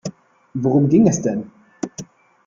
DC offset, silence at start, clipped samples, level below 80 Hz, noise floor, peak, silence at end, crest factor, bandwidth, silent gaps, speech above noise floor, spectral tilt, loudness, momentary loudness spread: under 0.1%; 0.05 s; under 0.1%; -56 dBFS; -39 dBFS; -4 dBFS; 0.45 s; 16 dB; 7.6 kHz; none; 23 dB; -7.5 dB/octave; -17 LUFS; 20 LU